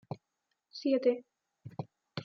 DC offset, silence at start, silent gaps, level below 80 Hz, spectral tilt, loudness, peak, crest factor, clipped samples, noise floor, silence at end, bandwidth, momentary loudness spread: under 0.1%; 0.1 s; none; -84 dBFS; -6 dB/octave; -32 LUFS; -16 dBFS; 20 dB; under 0.1%; -84 dBFS; 0 s; 6.8 kHz; 19 LU